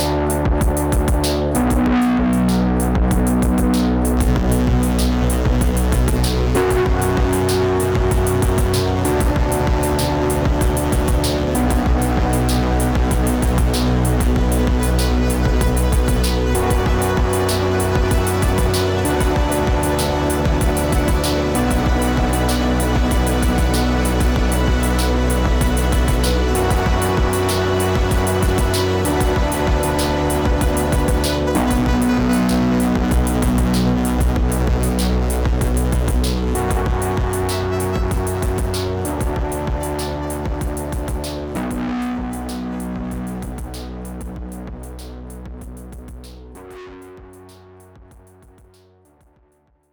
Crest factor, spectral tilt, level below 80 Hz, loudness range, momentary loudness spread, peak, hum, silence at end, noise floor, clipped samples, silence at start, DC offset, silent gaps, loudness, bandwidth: 14 dB; -5.5 dB/octave; -22 dBFS; 8 LU; 9 LU; -2 dBFS; none; 1.9 s; -59 dBFS; under 0.1%; 0 s; under 0.1%; none; -18 LUFS; over 20 kHz